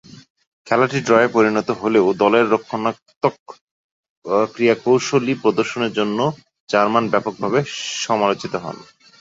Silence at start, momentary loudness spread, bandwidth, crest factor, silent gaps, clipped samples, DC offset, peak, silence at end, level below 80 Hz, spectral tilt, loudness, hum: 0.1 s; 9 LU; 7.8 kHz; 18 dB; 0.30-0.36 s, 0.47-0.65 s, 3.16-3.21 s, 3.39-3.46 s, 3.61-4.03 s, 4.09-4.22 s, 6.60-6.67 s; under 0.1%; under 0.1%; -2 dBFS; 0.35 s; -62 dBFS; -5 dB/octave; -18 LUFS; none